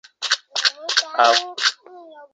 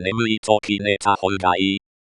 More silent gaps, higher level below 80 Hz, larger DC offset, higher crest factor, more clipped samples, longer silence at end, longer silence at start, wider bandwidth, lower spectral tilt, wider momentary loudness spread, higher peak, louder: second, none vs 0.38-0.43 s; second, -88 dBFS vs -58 dBFS; neither; about the same, 20 dB vs 20 dB; neither; second, 0.1 s vs 0.35 s; first, 0.2 s vs 0 s; second, 9.4 kHz vs 11 kHz; second, 3 dB/octave vs -4.5 dB/octave; first, 6 LU vs 3 LU; about the same, 0 dBFS vs -2 dBFS; about the same, -19 LUFS vs -20 LUFS